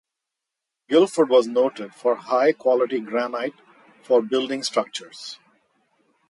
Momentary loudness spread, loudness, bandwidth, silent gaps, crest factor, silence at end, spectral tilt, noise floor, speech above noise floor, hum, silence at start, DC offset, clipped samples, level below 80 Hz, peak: 15 LU; -22 LUFS; 11.5 kHz; none; 18 dB; 0.95 s; -4 dB/octave; -84 dBFS; 63 dB; none; 0.9 s; under 0.1%; under 0.1%; -76 dBFS; -4 dBFS